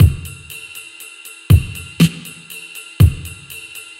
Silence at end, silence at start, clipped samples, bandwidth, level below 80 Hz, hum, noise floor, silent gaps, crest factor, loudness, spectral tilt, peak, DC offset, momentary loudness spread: 0.2 s; 0 s; under 0.1%; 16.5 kHz; -26 dBFS; none; -37 dBFS; none; 18 dB; -16 LUFS; -6 dB/octave; 0 dBFS; under 0.1%; 18 LU